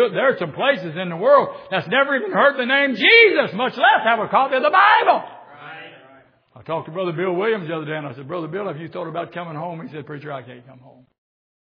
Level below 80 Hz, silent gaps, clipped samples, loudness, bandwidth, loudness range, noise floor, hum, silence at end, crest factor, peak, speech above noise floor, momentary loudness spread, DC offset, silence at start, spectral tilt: -76 dBFS; none; under 0.1%; -17 LUFS; 5.4 kHz; 15 LU; -51 dBFS; none; 0.95 s; 18 dB; -2 dBFS; 32 dB; 19 LU; under 0.1%; 0 s; -7 dB/octave